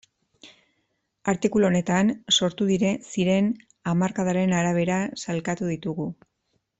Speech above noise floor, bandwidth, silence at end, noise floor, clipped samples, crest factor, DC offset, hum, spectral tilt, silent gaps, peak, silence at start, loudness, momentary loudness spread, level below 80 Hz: 51 dB; 8.2 kHz; 0.65 s; -74 dBFS; under 0.1%; 16 dB; under 0.1%; none; -5 dB/octave; none; -8 dBFS; 0.45 s; -24 LUFS; 8 LU; -60 dBFS